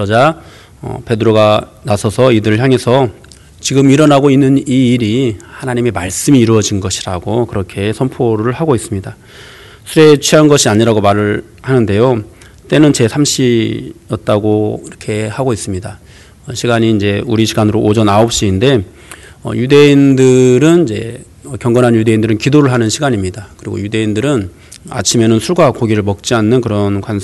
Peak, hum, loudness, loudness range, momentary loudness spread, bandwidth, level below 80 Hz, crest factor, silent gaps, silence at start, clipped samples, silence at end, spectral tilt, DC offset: 0 dBFS; none; -11 LUFS; 5 LU; 14 LU; 12.5 kHz; -42 dBFS; 12 dB; none; 0 s; 0.4%; 0 s; -5.5 dB/octave; under 0.1%